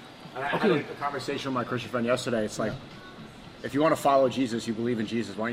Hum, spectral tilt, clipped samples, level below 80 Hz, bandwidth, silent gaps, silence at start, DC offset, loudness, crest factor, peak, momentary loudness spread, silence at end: none; -5.5 dB/octave; under 0.1%; -60 dBFS; 16 kHz; none; 0 s; under 0.1%; -28 LUFS; 18 dB; -10 dBFS; 18 LU; 0 s